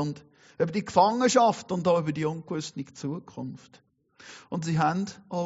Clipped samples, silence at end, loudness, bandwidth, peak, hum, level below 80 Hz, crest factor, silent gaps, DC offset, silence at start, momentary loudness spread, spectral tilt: under 0.1%; 0 s; -27 LUFS; 8 kHz; -6 dBFS; none; -68 dBFS; 22 dB; none; under 0.1%; 0 s; 18 LU; -5.5 dB/octave